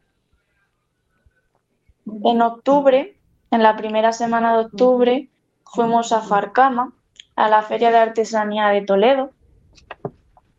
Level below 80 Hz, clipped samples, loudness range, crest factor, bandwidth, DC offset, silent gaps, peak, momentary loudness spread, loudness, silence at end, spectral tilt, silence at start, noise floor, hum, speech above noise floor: -62 dBFS; under 0.1%; 2 LU; 18 dB; 8 kHz; under 0.1%; none; 0 dBFS; 15 LU; -17 LUFS; 0.5 s; -5 dB/octave; 2.05 s; -69 dBFS; none; 52 dB